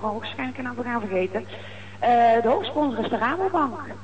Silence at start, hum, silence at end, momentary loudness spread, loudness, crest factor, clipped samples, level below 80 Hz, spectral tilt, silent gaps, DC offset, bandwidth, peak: 0 s; 50 Hz at -45 dBFS; 0 s; 13 LU; -24 LUFS; 14 dB; under 0.1%; -62 dBFS; -6.5 dB/octave; none; 0.7%; 8.6 kHz; -8 dBFS